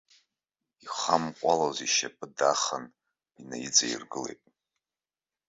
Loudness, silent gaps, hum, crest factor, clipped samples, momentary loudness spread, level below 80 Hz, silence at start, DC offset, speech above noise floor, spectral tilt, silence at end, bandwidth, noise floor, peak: -28 LUFS; none; none; 26 dB; under 0.1%; 14 LU; -74 dBFS; 0.85 s; under 0.1%; over 61 dB; -1.5 dB/octave; 1.15 s; 8 kHz; under -90 dBFS; -6 dBFS